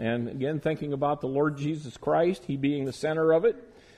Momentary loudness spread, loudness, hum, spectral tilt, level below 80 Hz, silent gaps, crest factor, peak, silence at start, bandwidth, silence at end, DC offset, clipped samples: 8 LU; -28 LUFS; none; -7.5 dB/octave; -60 dBFS; none; 14 dB; -12 dBFS; 0 s; 11.5 kHz; 0.35 s; under 0.1%; under 0.1%